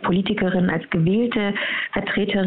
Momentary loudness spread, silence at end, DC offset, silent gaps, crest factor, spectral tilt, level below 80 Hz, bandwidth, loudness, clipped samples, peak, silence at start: 3 LU; 0 s; under 0.1%; none; 14 dB; -10.5 dB/octave; -48 dBFS; 4.4 kHz; -21 LUFS; under 0.1%; -6 dBFS; 0 s